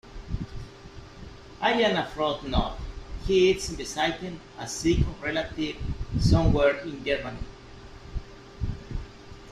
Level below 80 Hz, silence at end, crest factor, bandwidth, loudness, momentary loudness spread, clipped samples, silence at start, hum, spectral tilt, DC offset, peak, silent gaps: -36 dBFS; 0 s; 20 dB; 13 kHz; -27 LUFS; 23 LU; under 0.1%; 0.05 s; none; -5.5 dB/octave; under 0.1%; -8 dBFS; none